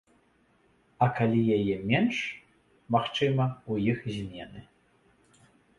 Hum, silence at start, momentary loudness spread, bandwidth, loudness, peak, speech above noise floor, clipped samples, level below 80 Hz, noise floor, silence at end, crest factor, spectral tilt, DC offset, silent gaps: none; 1 s; 14 LU; 10.5 kHz; -28 LUFS; -10 dBFS; 39 dB; under 0.1%; -60 dBFS; -66 dBFS; 1.15 s; 20 dB; -7 dB/octave; under 0.1%; none